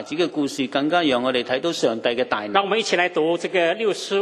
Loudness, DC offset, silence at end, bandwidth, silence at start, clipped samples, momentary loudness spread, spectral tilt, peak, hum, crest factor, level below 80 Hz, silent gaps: -21 LUFS; under 0.1%; 0 s; 13 kHz; 0 s; under 0.1%; 4 LU; -4 dB/octave; -2 dBFS; none; 18 dB; -66 dBFS; none